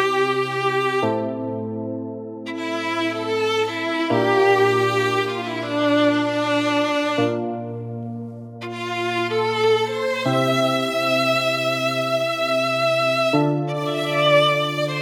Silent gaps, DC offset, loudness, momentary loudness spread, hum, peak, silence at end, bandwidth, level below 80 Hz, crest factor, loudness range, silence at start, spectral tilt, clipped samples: none; under 0.1%; -20 LUFS; 12 LU; none; -6 dBFS; 0 s; 17.5 kHz; -72 dBFS; 16 dB; 4 LU; 0 s; -5 dB/octave; under 0.1%